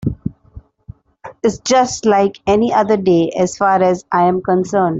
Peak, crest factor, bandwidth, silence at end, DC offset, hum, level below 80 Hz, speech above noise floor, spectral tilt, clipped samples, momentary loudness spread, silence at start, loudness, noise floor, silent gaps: -2 dBFS; 14 dB; 8 kHz; 0 s; under 0.1%; none; -44 dBFS; 26 dB; -5.5 dB/octave; under 0.1%; 6 LU; 0 s; -15 LUFS; -40 dBFS; none